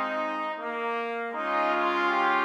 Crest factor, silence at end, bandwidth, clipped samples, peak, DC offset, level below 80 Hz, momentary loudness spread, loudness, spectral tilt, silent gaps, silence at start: 14 dB; 0 s; 10.5 kHz; under 0.1%; -14 dBFS; under 0.1%; -86 dBFS; 7 LU; -28 LUFS; -4 dB/octave; none; 0 s